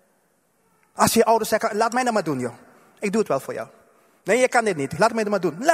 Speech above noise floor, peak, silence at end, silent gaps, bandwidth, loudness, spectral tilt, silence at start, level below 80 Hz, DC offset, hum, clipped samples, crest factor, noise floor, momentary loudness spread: 44 dB; 0 dBFS; 0 s; none; 16 kHz; -21 LUFS; -4 dB/octave; 0.95 s; -60 dBFS; under 0.1%; none; under 0.1%; 22 dB; -65 dBFS; 14 LU